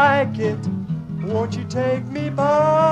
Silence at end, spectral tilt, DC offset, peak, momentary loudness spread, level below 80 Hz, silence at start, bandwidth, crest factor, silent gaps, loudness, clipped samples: 0 s; -7 dB/octave; under 0.1%; -4 dBFS; 10 LU; -54 dBFS; 0 s; 9.8 kHz; 16 dB; none; -21 LUFS; under 0.1%